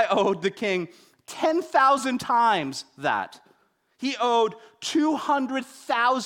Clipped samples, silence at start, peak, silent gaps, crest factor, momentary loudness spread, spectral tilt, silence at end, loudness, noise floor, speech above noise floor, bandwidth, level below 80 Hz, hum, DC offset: under 0.1%; 0 s; -8 dBFS; none; 16 dB; 12 LU; -4 dB/octave; 0 s; -24 LUFS; -64 dBFS; 40 dB; 17 kHz; -70 dBFS; none; under 0.1%